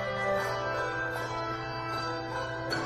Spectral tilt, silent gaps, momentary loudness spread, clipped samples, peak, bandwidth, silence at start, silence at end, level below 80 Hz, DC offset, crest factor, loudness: -4.5 dB/octave; none; 5 LU; under 0.1%; -16 dBFS; 13.5 kHz; 0 s; 0 s; -54 dBFS; under 0.1%; 16 dB; -32 LUFS